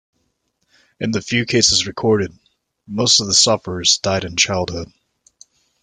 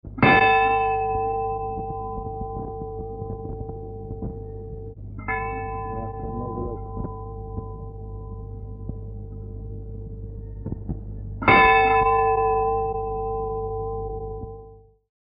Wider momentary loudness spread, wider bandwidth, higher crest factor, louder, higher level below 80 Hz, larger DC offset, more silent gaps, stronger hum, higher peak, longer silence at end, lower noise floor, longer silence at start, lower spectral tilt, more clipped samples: second, 14 LU vs 20 LU; first, 11 kHz vs 5 kHz; about the same, 20 dB vs 24 dB; first, -16 LUFS vs -23 LUFS; second, -50 dBFS vs -38 dBFS; neither; neither; neither; about the same, 0 dBFS vs -2 dBFS; first, 0.95 s vs 0.5 s; first, -69 dBFS vs -47 dBFS; first, 1 s vs 0.05 s; second, -2.5 dB/octave vs -8.5 dB/octave; neither